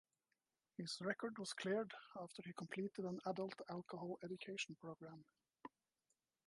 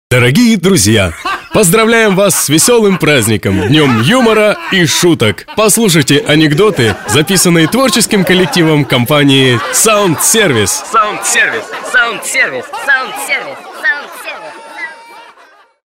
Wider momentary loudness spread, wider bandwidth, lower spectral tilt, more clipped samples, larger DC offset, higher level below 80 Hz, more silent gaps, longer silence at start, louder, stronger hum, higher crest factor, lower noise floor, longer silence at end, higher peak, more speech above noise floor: first, 15 LU vs 8 LU; second, 11.5 kHz vs 16.5 kHz; about the same, -4.5 dB/octave vs -3.5 dB/octave; neither; neither; second, under -90 dBFS vs -42 dBFS; neither; first, 0.8 s vs 0.1 s; second, -48 LUFS vs -9 LUFS; neither; first, 20 dB vs 10 dB; first, under -90 dBFS vs -43 dBFS; first, 0.8 s vs 0.6 s; second, -28 dBFS vs 0 dBFS; first, over 42 dB vs 34 dB